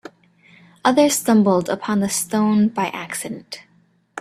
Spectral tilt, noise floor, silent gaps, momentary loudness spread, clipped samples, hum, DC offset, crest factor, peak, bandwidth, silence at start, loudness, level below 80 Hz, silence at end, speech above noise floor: -4.5 dB/octave; -52 dBFS; none; 17 LU; under 0.1%; none; under 0.1%; 18 dB; -2 dBFS; 14.5 kHz; 0.85 s; -19 LUFS; -62 dBFS; 0 s; 34 dB